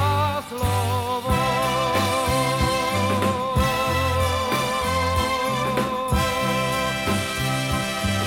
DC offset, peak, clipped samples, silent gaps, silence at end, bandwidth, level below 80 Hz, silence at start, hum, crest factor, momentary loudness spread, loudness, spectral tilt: under 0.1%; -8 dBFS; under 0.1%; none; 0 s; 17.5 kHz; -36 dBFS; 0 s; none; 14 dB; 2 LU; -22 LUFS; -4.5 dB/octave